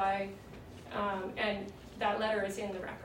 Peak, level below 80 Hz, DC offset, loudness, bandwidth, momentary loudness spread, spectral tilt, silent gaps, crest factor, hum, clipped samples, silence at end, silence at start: -20 dBFS; -60 dBFS; under 0.1%; -36 LUFS; 16 kHz; 15 LU; -4.5 dB/octave; none; 16 dB; none; under 0.1%; 0 s; 0 s